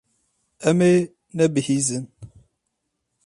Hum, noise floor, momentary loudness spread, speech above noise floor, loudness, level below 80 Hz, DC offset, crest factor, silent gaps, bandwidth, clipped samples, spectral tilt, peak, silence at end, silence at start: none; -77 dBFS; 14 LU; 58 dB; -21 LUFS; -62 dBFS; under 0.1%; 18 dB; none; 11.5 kHz; under 0.1%; -5.5 dB/octave; -6 dBFS; 1 s; 0.6 s